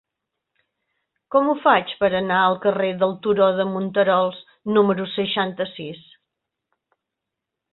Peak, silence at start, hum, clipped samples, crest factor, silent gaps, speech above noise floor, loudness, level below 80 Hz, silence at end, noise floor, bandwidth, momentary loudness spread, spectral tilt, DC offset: -2 dBFS; 1.3 s; none; under 0.1%; 20 dB; none; 63 dB; -20 LUFS; -62 dBFS; 1.75 s; -83 dBFS; 4.2 kHz; 9 LU; -10 dB/octave; under 0.1%